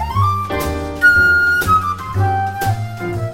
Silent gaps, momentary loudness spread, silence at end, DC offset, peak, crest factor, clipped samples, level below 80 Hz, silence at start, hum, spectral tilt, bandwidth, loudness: none; 12 LU; 0 s; under 0.1%; -2 dBFS; 14 dB; under 0.1%; -34 dBFS; 0 s; none; -5.5 dB/octave; 16.5 kHz; -15 LUFS